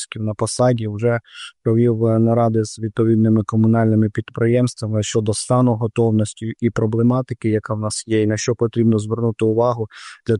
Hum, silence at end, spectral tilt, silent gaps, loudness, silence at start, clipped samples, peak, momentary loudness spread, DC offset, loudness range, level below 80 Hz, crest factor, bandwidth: none; 0 s; -6.5 dB/octave; none; -18 LUFS; 0 s; under 0.1%; -6 dBFS; 7 LU; under 0.1%; 2 LU; -54 dBFS; 12 dB; 11 kHz